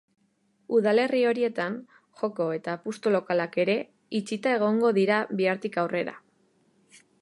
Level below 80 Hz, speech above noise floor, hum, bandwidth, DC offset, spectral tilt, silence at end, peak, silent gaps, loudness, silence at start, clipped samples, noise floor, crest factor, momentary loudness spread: -78 dBFS; 43 dB; none; 11.5 kHz; under 0.1%; -6 dB/octave; 1.05 s; -10 dBFS; none; -26 LUFS; 0.7 s; under 0.1%; -69 dBFS; 16 dB; 10 LU